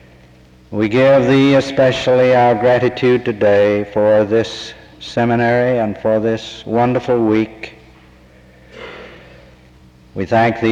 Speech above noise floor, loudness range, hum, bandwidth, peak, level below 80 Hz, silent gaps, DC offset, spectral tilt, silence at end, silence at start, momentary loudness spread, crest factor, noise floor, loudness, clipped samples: 31 dB; 9 LU; none; 8.8 kHz; -4 dBFS; -48 dBFS; none; under 0.1%; -7 dB/octave; 0 s; 0.7 s; 21 LU; 12 dB; -45 dBFS; -14 LUFS; under 0.1%